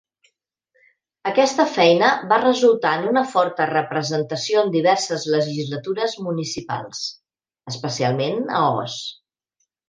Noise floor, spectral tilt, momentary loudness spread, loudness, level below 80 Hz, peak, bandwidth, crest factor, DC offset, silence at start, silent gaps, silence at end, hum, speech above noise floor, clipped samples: -74 dBFS; -4.5 dB/octave; 13 LU; -20 LUFS; -68 dBFS; -2 dBFS; 9.8 kHz; 20 dB; under 0.1%; 1.25 s; none; 0.75 s; none; 54 dB; under 0.1%